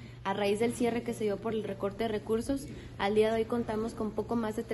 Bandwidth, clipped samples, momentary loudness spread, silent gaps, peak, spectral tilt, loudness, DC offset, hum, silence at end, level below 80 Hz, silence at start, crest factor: 12.5 kHz; under 0.1%; 8 LU; none; -16 dBFS; -5.5 dB/octave; -32 LUFS; under 0.1%; none; 0 s; -54 dBFS; 0 s; 16 dB